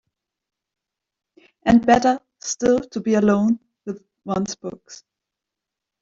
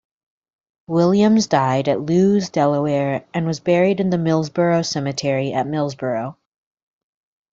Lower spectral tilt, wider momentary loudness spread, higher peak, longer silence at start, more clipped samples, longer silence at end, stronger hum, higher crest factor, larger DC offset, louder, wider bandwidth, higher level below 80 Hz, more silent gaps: about the same, -5.5 dB/octave vs -6.5 dB/octave; first, 18 LU vs 8 LU; about the same, -4 dBFS vs -2 dBFS; first, 1.65 s vs 0.9 s; neither; second, 1.05 s vs 1.2 s; neither; about the same, 20 dB vs 18 dB; neither; about the same, -20 LUFS vs -19 LUFS; about the same, 7.8 kHz vs 7.8 kHz; first, -52 dBFS vs -58 dBFS; neither